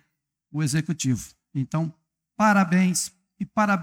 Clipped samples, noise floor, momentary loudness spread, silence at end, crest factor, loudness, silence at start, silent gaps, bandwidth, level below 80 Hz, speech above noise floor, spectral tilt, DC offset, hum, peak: under 0.1%; -75 dBFS; 13 LU; 0 s; 18 dB; -24 LUFS; 0.55 s; none; 16.5 kHz; -60 dBFS; 53 dB; -5 dB/octave; under 0.1%; none; -6 dBFS